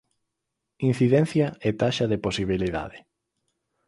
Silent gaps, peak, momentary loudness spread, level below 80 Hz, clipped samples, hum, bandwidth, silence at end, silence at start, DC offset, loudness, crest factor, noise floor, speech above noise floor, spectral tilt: none; -8 dBFS; 8 LU; -50 dBFS; under 0.1%; none; 11.5 kHz; 0.9 s; 0.8 s; under 0.1%; -24 LUFS; 18 dB; -82 dBFS; 59 dB; -6.5 dB/octave